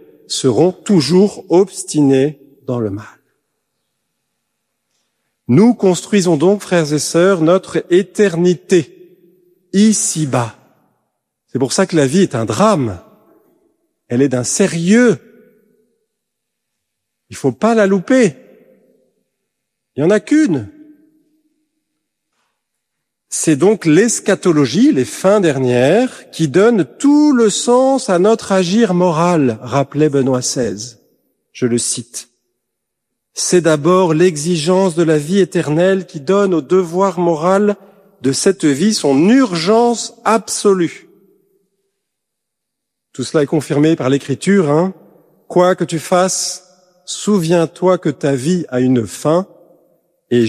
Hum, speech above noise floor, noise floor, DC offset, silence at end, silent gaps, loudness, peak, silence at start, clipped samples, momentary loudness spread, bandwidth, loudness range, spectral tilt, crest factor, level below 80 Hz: none; 65 dB; -77 dBFS; under 0.1%; 0 s; none; -14 LUFS; 0 dBFS; 0.3 s; under 0.1%; 10 LU; 14.5 kHz; 7 LU; -5 dB/octave; 14 dB; -58 dBFS